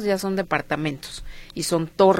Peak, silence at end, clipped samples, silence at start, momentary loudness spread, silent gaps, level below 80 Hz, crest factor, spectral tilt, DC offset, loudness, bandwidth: -4 dBFS; 0 s; under 0.1%; 0 s; 14 LU; none; -44 dBFS; 18 dB; -5 dB/octave; under 0.1%; -24 LUFS; 16.5 kHz